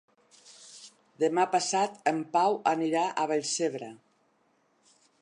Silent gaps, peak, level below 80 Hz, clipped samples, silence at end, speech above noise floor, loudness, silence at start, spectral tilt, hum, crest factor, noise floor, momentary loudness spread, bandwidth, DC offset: none; -10 dBFS; -86 dBFS; under 0.1%; 1.25 s; 42 dB; -28 LUFS; 0.6 s; -3.5 dB/octave; none; 20 dB; -70 dBFS; 21 LU; 11 kHz; under 0.1%